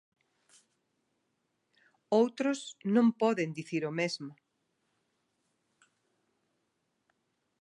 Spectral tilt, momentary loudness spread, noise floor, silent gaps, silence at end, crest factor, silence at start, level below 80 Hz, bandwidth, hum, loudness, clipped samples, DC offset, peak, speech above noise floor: -5.5 dB/octave; 9 LU; -80 dBFS; none; 3.3 s; 20 dB; 2.1 s; -88 dBFS; 10.5 kHz; none; -31 LUFS; under 0.1%; under 0.1%; -14 dBFS; 50 dB